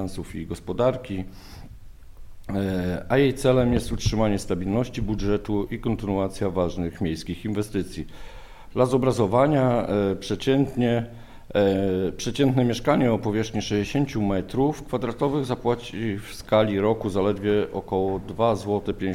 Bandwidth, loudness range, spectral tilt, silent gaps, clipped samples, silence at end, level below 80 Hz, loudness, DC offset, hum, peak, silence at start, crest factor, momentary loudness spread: 16 kHz; 4 LU; -6.5 dB/octave; none; under 0.1%; 0 s; -40 dBFS; -24 LUFS; under 0.1%; none; -6 dBFS; 0 s; 18 dB; 11 LU